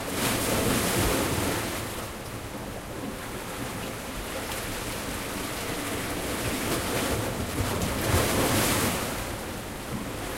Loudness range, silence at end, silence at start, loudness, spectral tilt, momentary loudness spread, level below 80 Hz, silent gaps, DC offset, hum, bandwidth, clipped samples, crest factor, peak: 7 LU; 0 s; 0 s; -29 LUFS; -3.5 dB/octave; 11 LU; -42 dBFS; none; under 0.1%; none; 16 kHz; under 0.1%; 18 dB; -10 dBFS